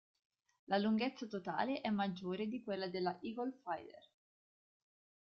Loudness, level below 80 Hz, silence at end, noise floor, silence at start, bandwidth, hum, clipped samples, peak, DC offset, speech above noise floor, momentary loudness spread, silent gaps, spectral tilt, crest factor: -40 LUFS; -80 dBFS; 1.2 s; under -90 dBFS; 0.7 s; 6.6 kHz; none; under 0.1%; -22 dBFS; under 0.1%; over 50 dB; 9 LU; none; -4.5 dB/octave; 20 dB